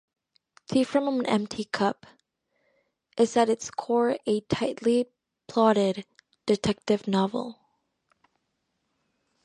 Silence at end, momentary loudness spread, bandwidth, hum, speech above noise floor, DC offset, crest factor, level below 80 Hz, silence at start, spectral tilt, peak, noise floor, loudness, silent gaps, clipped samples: 1.9 s; 12 LU; 11 kHz; none; 53 dB; under 0.1%; 20 dB; -62 dBFS; 0.7 s; -5.5 dB/octave; -8 dBFS; -78 dBFS; -26 LUFS; none; under 0.1%